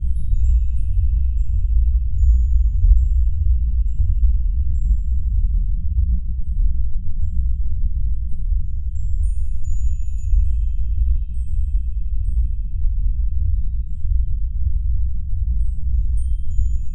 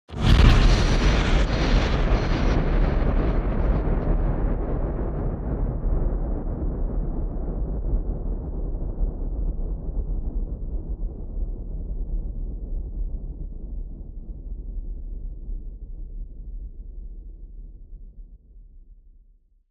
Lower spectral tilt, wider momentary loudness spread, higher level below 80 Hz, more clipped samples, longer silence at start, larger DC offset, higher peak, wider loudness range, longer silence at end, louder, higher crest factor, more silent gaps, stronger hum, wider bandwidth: first, -9 dB/octave vs -6.5 dB/octave; second, 7 LU vs 19 LU; first, -18 dBFS vs -24 dBFS; neither; about the same, 0 s vs 0.1 s; neither; about the same, -2 dBFS vs -2 dBFS; second, 5 LU vs 18 LU; second, 0 s vs 0.6 s; first, -23 LUFS vs -26 LUFS; second, 14 dB vs 22 dB; neither; neither; second, 0.3 kHz vs 7.8 kHz